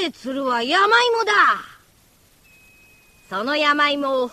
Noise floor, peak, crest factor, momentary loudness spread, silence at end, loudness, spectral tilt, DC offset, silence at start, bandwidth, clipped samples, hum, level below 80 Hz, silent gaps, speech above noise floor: -55 dBFS; -4 dBFS; 18 dB; 11 LU; 0.05 s; -18 LUFS; -2 dB/octave; under 0.1%; 0 s; 14 kHz; under 0.1%; none; -64 dBFS; none; 37 dB